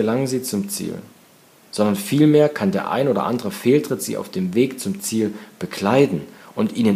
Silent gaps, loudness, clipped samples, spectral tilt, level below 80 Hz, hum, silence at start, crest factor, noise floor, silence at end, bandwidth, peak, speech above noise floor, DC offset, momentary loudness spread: none; -20 LUFS; under 0.1%; -5.5 dB/octave; -64 dBFS; none; 0 s; 18 dB; -51 dBFS; 0 s; 15.5 kHz; -2 dBFS; 31 dB; under 0.1%; 12 LU